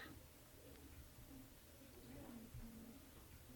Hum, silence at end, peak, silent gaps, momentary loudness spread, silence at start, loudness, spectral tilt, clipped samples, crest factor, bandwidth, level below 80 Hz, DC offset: none; 0 s; -44 dBFS; none; 5 LU; 0 s; -60 LUFS; -4.5 dB/octave; under 0.1%; 14 dB; 18 kHz; -66 dBFS; under 0.1%